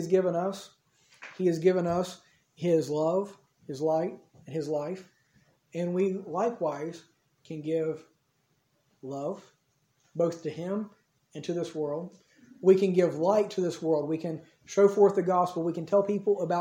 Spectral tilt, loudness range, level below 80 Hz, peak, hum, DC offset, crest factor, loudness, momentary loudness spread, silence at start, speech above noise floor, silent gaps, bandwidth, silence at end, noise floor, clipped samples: -7 dB/octave; 10 LU; -74 dBFS; -10 dBFS; none; under 0.1%; 20 dB; -28 LUFS; 19 LU; 0 s; 45 dB; none; 15.5 kHz; 0 s; -73 dBFS; under 0.1%